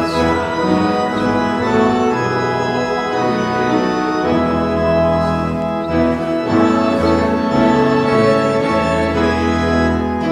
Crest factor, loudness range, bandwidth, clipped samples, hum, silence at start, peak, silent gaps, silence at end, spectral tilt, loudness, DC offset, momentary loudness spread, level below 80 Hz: 14 dB; 2 LU; 11.5 kHz; under 0.1%; none; 0 s; -2 dBFS; none; 0 s; -6.5 dB/octave; -16 LUFS; under 0.1%; 4 LU; -34 dBFS